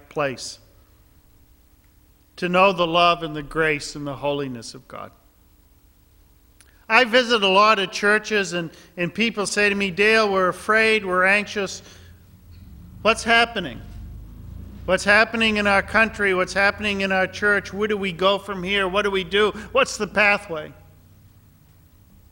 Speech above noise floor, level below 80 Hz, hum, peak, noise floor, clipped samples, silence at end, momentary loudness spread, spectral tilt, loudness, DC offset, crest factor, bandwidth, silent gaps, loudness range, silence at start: 35 dB; -48 dBFS; none; 0 dBFS; -55 dBFS; under 0.1%; 1.6 s; 18 LU; -3.5 dB/octave; -19 LUFS; under 0.1%; 22 dB; 16.5 kHz; none; 5 LU; 0.15 s